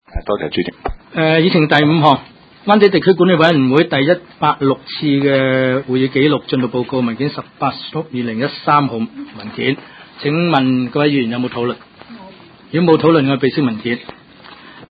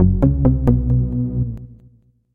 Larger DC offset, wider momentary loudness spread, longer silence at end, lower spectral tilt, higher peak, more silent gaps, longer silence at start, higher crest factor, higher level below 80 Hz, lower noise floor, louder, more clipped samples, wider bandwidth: neither; about the same, 12 LU vs 10 LU; second, 0.05 s vs 0.6 s; second, -8.5 dB/octave vs -12.5 dB/octave; about the same, 0 dBFS vs -2 dBFS; neither; first, 0.15 s vs 0 s; about the same, 16 dB vs 16 dB; second, -42 dBFS vs -24 dBFS; second, -40 dBFS vs -52 dBFS; first, -15 LUFS vs -18 LUFS; neither; first, 8 kHz vs 2.4 kHz